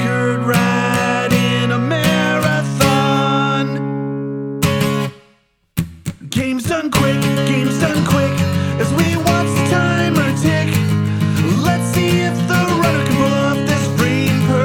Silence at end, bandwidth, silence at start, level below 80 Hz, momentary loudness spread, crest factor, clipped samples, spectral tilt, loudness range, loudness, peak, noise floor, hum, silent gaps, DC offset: 0 s; over 20 kHz; 0 s; -44 dBFS; 7 LU; 14 dB; under 0.1%; -5.5 dB/octave; 4 LU; -16 LUFS; -2 dBFS; -56 dBFS; none; none; under 0.1%